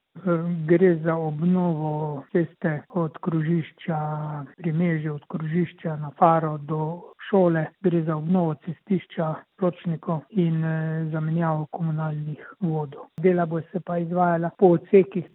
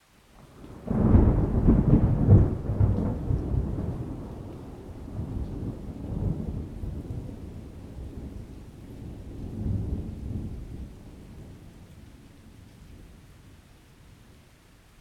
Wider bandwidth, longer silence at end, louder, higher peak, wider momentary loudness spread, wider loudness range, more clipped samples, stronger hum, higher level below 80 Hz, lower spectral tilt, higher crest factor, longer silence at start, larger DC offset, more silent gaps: second, 4 kHz vs 8.4 kHz; second, 0.1 s vs 1.5 s; first, -24 LUFS vs -27 LUFS; first, -2 dBFS vs -6 dBFS; second, 11 LU vs 25 LU; second, 3 LU vs 19 LU; neither; neither; second, -70 dBFS vs -34 dBFS; first, -12 dB/octave vs -10.5 dB/octave; about the same, 22 dB vs 22 dB; second, 0.15 s vs 0.4 s; neither; neither